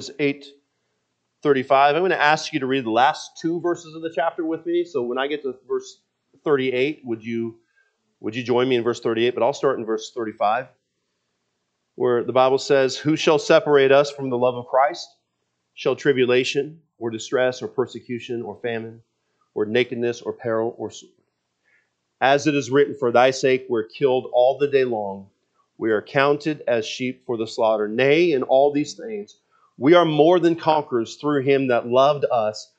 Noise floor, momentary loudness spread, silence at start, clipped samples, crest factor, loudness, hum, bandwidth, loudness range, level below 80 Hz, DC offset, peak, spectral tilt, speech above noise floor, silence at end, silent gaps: -75 dBFS; 12 LU; 0 s; under 0.1%; 20 dB; -21 LUFS; none; 8.4 kHz; 7 LU; -76 dBFS; under 0.1%; 0 dBFS; -5 dB/octave; 55 dB; 0.15 s; none